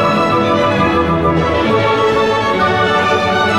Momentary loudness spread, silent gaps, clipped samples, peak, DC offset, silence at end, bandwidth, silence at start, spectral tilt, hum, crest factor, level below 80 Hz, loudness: 1 LU; none; under 0.1%; -2 dBFS; 0.5%; 0 s; 14 kHz; 0 s; -6 dB/octave; none; 10 dB; -36 dBFS; -13 LUFS